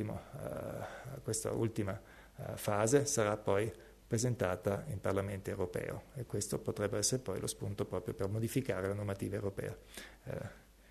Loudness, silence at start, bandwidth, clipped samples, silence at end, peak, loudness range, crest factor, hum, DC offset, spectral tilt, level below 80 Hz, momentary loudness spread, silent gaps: -37 LUFS; 0 s; 13.5 kHz; under 0.1%; 0.1 s; -16 dBFS; 4 LU; 22 dB; none; under 0.1%; -5 dB/octave; -60 dBFS; 13 LU; none